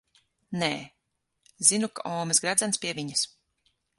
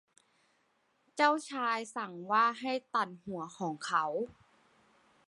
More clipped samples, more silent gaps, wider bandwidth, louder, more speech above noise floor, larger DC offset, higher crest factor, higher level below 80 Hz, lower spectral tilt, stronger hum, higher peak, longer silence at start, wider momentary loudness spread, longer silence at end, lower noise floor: neither; neither; about the same, 12 kHz vs 11.5 kHz; first, -26 LUFS vs -33 LUFS; first, 51 dB vs 41 dB; neither; about the same, 26 dB vs 22 dB; first, -70 dBFS vs -80 dBFS; second, -2 dB/octave vs -4 dB/octave; neither; first, -4 dBFS vs -12 dBFS; second, 0.5 s vs 1.15 s; about the same, 11 LU vs 13 LU; second, 0.7 s vs 0.95 s; first, -79 dBFS vs -74 dBFS